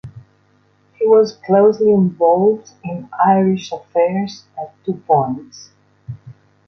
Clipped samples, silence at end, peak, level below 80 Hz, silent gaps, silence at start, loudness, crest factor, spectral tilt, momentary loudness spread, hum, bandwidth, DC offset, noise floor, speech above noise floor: under 0.1%; 0.35 s; -2 dBFS; -58 dBFS; none; 0.05 s; -16 LUFS; 16 dB; -7.5 dB/octave; 18 LU; 50 Hz at -40 dBFS; 6.6 kHz; under 0.1%; -56 dBFS; 41 dB